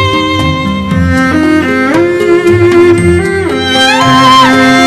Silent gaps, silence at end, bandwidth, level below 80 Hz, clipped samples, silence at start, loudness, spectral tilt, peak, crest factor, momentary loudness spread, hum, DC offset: none; 0 s; 13 kHz; -30 dBFS; 2%; 0 s; -7 LUFS; -5 dB/octave; 0 dBFS; 6 dB; 7 LU; none; under 0.1%